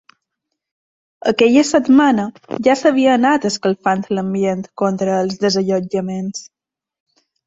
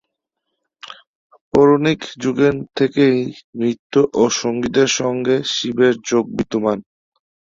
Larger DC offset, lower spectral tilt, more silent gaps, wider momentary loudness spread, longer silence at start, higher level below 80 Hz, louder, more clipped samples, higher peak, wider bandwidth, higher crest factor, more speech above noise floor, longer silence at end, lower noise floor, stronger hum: neither; about the same, -5 dB/octave vs -4.5 dB/octave; second, none vs 1.07-1.30 s, 1.41-1.51 s, 3.44-3.53 s, 3.79-3.90 s; about the same, 10 LU vs 8 LU; first, 1.25 s vs 0.85 s; about the same, -58 dBFS vs -54 dBFS; about the same, -16 LUFS vs -17 LUFS; neither; about the same, -2 dBFS vs -2 dBFS; about the same, 8 kHz vs 7.6 kHz; about the same, 16 dB vs 16 dB; about the same, 62 dB vs 60 dB; first, 1.05 s vs 0.75 s; about the same, -78 dBFS vs -77 dBFS; neither